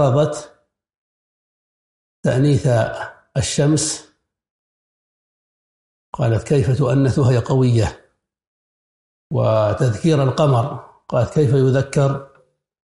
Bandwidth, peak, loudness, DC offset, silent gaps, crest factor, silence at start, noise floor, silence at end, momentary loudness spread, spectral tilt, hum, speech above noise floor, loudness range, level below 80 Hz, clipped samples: 11.5 kHz; -4 dBFS; -18 LUFS; under 0.1%; 0.97-2.23 s, 4.50-6.13 s, 8.47-9.30 s; 16 dB; 0 s; -57 dBFS; 0.6 s; 10 LU; -6.5 dB/octave; none; 40 dB; 5 LU; -46 dBFS; under 0.1%